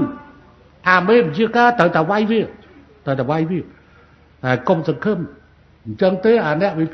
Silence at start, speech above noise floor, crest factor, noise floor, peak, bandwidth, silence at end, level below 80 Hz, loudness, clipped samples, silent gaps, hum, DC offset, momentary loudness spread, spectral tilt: 0 s; 33 dB; 18 dB; -49 dBFS; 0 dBFS; 6.4 kHz; 0 s; -52 dBFS; -17 LUFS; under 0.1%; none; none; under 0.1%; 16 LU; -7.5 dB/octave